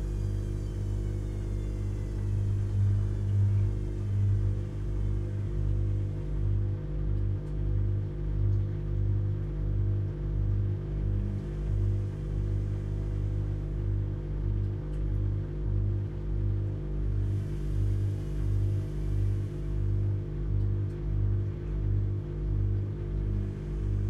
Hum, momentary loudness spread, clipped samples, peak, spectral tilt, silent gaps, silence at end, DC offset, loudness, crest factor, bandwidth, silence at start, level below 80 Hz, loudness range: 50 Hz at -30 dBFS; 5 LU; under 0.1%; -18 dBFS; -9.5 dB/octave; none; 0 s; under 0.1%; -32 LUFS; 12 dB; 3.8 kHz; 0 s; -34 dBFS; 3 LU